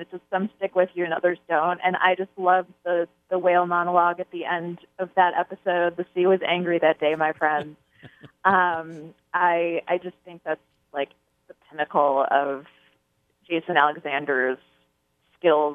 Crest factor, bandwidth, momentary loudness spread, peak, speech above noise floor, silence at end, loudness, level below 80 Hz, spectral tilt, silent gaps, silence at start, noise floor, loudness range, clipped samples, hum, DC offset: 20 dB; 4 kHz; 11 LU; -4 dBFS; 46 dB; 0 s; -23 LUFS; -74 dBFS; -7.5 dB/octave; none; 0 s; -69 dBFS; 4 LU; under 0.1%; none; under 0.1%